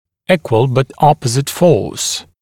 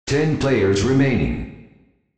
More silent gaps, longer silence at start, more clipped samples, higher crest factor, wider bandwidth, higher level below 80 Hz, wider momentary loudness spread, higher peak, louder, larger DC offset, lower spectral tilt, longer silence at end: neither; first, 0.3 s vs 0.05 s; neither; about the same, 14 dB vs 14 dB; first, 17.5 kHz vs 8.8 kHz; second, -46 dBFS vs -36 dBFS; second, 6 LU vs 11 LU; first, 0 dBFS vs -6 dBFS; first, -14 LUFS vs -19 LUFS; neither; second, -5 dB/octave vs -6.5 dB/octave; second, 0.2 s vs 0.5 s